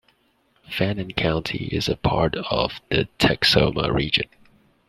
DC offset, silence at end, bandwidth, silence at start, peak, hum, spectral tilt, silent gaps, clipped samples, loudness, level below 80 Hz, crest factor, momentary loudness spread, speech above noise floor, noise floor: under 0.1%; 0.65 s; 15 kHz; 0.7 s; -2 dBFS; none; -5.5 dB/octave; none; under 0.1%; -22 LUFS; -40 dBFS; 22 dB; 8 LU; 42 dB; -64 dBFS